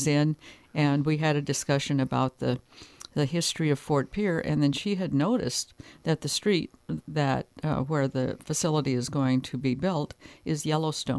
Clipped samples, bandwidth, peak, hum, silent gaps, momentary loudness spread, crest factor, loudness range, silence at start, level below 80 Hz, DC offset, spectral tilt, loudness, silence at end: under 0.1%; 11 kHz; -10 dBFS; none; none; 8 LU; 16 dB; 1 LU; 0 s; -56 dBFS; under 0.1%; -5.5 dB/octave; -28 LUFS; 0 s